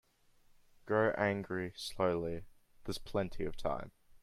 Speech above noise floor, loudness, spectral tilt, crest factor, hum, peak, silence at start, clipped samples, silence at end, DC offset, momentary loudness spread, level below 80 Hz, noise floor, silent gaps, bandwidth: 31 dB; -37 LUFS; -6 dB/octave; 20 dB; none; -18 dBFS; 0.85 s; under 0.1%; 0.05 s; under 0.1%; 12 LU; -54 dBFS; -67 dBFS; none; 15 kHz